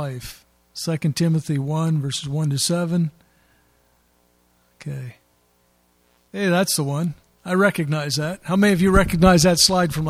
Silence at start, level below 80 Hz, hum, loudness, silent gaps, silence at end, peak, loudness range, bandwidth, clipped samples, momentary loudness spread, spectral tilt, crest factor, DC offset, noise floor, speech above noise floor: 0 s; -38 dBFS; none; -20 LUFS; none; 0 s; 0 dBFS; 13 LU; 16 kHz; under 0.1%; 19 LU; -4.5 dB/octave; 20 dB; under 0.1%; -62 dBFS; 42 dB